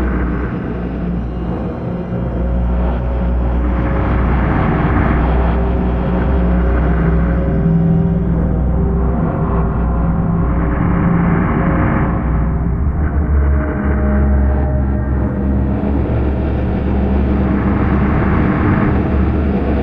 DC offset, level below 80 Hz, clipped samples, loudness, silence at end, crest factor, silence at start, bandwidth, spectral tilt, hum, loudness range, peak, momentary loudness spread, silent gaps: under 0.1%; -18 dBFS; under 0.1%; -16 LUFS; 0 s; 14 dB; 0 s; 3.8 kHz; -11 dB/octave; none; 2 LU; 0 dBFS; 5 LU; none